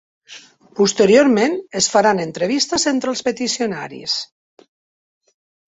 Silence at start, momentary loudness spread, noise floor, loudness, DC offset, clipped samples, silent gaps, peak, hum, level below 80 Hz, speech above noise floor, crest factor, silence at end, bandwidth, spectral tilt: 0.3 s; 11 LU; -43 dBFS; -17 LUFS; under 0.1%; under 0.1%; none; -2 dBFS; none; -60 dBFS; 26 dB; 18 dB; 1.4 s; 8.4 kHz; -3 dB/octave